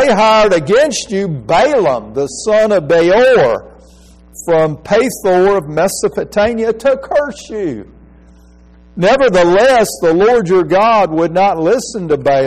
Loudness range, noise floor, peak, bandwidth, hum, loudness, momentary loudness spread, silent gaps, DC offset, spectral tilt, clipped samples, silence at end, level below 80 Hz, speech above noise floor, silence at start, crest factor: 5 LU; -42 dBFS; -2 dBFS; 15 kHz; none; -12 LUFS; 9 LU; none; under 0.1%; -5 dB/octave; under 0.1%; 0 s; -40 dBFS; 30 dB; 0 s; 10 dB